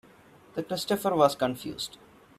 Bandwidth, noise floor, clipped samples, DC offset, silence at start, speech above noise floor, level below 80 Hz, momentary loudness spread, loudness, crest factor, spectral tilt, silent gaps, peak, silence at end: 15.5 kHz; -55 dBFS; under 0.1%; under 0.1%; 0.55 s; 28 dB; -66 dBFS; 14 LU; -28 LUFS; 24 dB; -4.5 dB/octave; none; -6 dBFS; 0.5 s